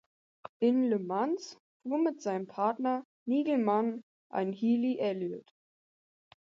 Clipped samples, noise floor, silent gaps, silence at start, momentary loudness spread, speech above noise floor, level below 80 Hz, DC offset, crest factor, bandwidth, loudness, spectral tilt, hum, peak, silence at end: under 0.1%; under -90 dBFS; 0.49-0.60 s, 1.60-1.80 s, 3.05-3.26 s, 4.03-4.30 s; 0.45 s; 16 LU; over 60 dB; -84 dBFS; under 0.1%; 16 dB; 7.4 kHz; -31 LUFS; -7 dB/octave; none; -16 dBFS; 1.1 s